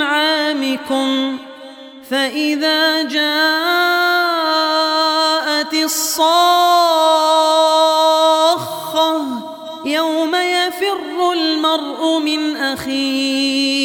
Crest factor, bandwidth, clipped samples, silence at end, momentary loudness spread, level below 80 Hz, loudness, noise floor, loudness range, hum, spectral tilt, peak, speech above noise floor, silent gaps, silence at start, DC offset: 14 dB; 19.5 kHz; under 0.1%; 0 s; 8 LU; -64 dBFS; -15 LUFS; -36 dBFS; 5 LU; none; -1.5 dB/octave; -2 dBFS; 21 dB; none; 0 s; under 0.1%